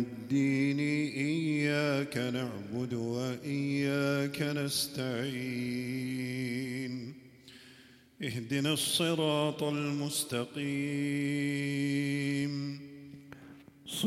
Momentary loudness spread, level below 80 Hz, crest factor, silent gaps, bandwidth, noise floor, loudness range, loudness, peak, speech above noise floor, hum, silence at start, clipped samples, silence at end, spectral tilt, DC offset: 13 LU; -72 dBFS; 18 dB; none; 16 kHz; -58 dBFS; 4 LU; -32 LUFS; -16 dBFS; 26 dB; none; 0 s; under 0.1%; 0 s; -5 dB/octave; under 0.1%